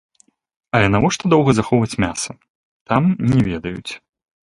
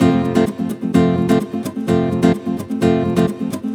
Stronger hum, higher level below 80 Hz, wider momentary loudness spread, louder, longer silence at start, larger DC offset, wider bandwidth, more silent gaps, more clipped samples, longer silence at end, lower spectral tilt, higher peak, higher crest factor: neither; first, -42 dBFS vs -48 dBFS; first, 13 LU vs 8 LU; about the same, -18 LUFS vs -17 LUFS; first, 0.75 s vs 0 s; neither; second, 11.5 kHz vs 16.5 kHz; first, 2.50-2.85 s vs none; neither; first, 0.55 s vs 0 s; second, -6 dB/octave vs -7.5 dB/octave; about the same, 0 dBFS vs 0 dBFS; about the same, 18 dB vs 16 dB